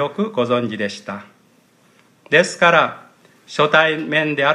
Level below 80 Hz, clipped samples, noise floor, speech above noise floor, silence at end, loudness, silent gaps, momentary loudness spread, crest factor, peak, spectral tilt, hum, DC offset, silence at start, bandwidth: -68 dBFS; under 0.1%; -55 dBFS; 38 dB; 0 s; -17 LUFS; none; 14 LU; 18 dB; 0 dBFS; -4.5 dB/octave; none; under 0.1%; 0 s; 11.5 kHz